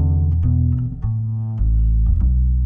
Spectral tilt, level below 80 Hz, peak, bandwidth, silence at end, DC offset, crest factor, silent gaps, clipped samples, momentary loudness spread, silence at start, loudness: -13.5 dB/octave; -18 dBFS; -8 dBFS; 1.4 kHz; 0 s; under 0.1%; 10 dB; none; under 0.1%; 5 LU; 0 s; -19 LUFS